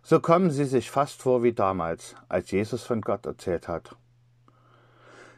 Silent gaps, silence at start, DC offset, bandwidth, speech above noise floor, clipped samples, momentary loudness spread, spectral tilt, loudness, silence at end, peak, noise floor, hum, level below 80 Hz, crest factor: none; 0.1 s; under 0.1%; 14.5 kHz; 35 dB; under 0.1%; 10 LU; -7 dB/octave; -26 LUFS; 0.15 s; -6 dBFS; -60 dBFS; none; -62 dBFS; 22 dB